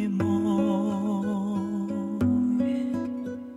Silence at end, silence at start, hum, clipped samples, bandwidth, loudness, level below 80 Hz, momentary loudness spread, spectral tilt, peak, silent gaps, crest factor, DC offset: 0 s; 0 s; none; under 0.1%; 11 kHz; -27 LUFS; -58 dBFS; 6 LU; -8.5 dB/octave; -14 dBFS; none; 12 dB; under 0.1%